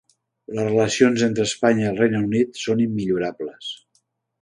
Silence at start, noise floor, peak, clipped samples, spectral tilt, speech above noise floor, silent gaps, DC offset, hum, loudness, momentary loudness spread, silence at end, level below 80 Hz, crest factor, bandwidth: 0.5 s; -68 dBFS; -2 dBFS; under 0.1%; -5 dB/octave; 47 dB; none; under 0.1%; none; -21 LUFS; 14 LU; 0.65 s; -58 dBFS; 20 dB; 11 kHz